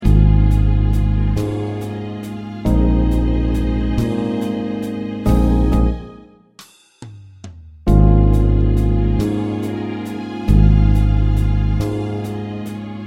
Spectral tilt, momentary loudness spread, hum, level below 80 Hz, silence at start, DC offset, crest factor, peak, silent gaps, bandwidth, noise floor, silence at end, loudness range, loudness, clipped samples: -9 dB/octave; 14 LU; none; -18 dBFS; 0 s; under 0.1%; 16 dB; 0 dBFS; none; 7.8 kHz; -46 dBFS; 0 s; 3 LU; -18 LUFS; under 0.1%